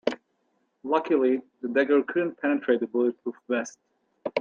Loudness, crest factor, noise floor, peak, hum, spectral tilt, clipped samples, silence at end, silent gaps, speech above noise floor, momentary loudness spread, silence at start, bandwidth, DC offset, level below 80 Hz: -26 LUFS; 20 dB; -72 dBFS; -8 dBFS; none; -5 dB/octave; under 0.1%; 0 s; none; 47 dB; 15 LU; 0.05 s; 7.4 kHz; under 0.1%; -78 dBFS